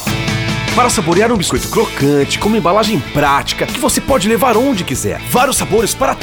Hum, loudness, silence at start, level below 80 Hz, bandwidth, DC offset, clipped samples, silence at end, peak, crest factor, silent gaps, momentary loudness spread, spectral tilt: none; -13 LUFS; 0 s; -32 dBFS; over 20 kHz; under 0.1%; under 0.1%; 0 s; 0 dBFS; 14 dB; none; 5 LU; -4 dB/octave